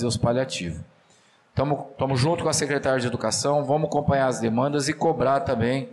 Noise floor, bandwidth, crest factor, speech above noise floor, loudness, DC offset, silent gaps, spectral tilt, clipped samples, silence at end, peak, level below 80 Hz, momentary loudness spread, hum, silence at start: -59 dBFS; 13 kHz; 12 dB; 35 dB; -24 LUFS; under 0.1%; none; -5 dB/octave; under 0.1%; 0 s; -12 dBFS; -50 dBFS; 6 LU; none; 0 s